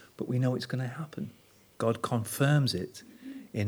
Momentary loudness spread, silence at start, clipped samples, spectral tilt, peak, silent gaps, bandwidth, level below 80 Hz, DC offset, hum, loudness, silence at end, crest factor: 17 LU; 0 s; under 0.1%; -6 dB/octave; -14 dBFS; none; over 20 kHz; -68 dBFS; under 0.1%; none; -31 LUFS; 0 s; 18 dB